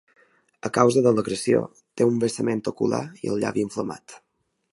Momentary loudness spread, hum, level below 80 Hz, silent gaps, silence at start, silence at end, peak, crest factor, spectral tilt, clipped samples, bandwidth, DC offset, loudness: 13 LU; none; -62 dBFS; none; 0.65 s; 0.55 s; -2 dBFS; 22 dB; -6 dB/octave; under 0.1%; 11.5 kHz; under 0.1%; -23 LUFS